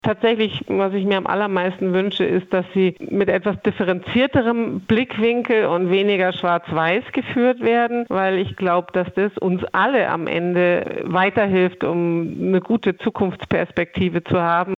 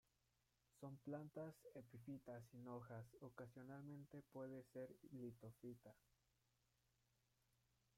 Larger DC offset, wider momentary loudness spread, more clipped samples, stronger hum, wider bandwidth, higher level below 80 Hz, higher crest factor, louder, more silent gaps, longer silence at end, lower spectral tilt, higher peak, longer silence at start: neither; about the same, 5 LU vs 6 LU; neither; neither; second, 6.6 kHz vs 16 kHz; first, -56 dBFS vs -86 dBFS; about the same, 14 dB vs 18 dB; first, -19 LUFS vs -59 LUFS; neither; second, 0 s vs 2 s; about the same, -8 dB/octave vs -8 dB/octave; first, -6 dBFS vs -42 dBFS; second, 0.05 s vs 0.75 s